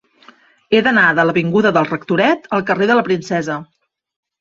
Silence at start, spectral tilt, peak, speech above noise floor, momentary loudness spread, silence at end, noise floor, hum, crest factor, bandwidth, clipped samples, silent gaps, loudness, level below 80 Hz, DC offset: 0.7 s; -6 dB/octave; 0 dBFS; 33 dB; 8 LU; 0.75 s; -48 dBFS; none; 16 dB; 7.8 kHz; under 0.1%; none; -15 LUFS; -58 dBFS; under 0.1%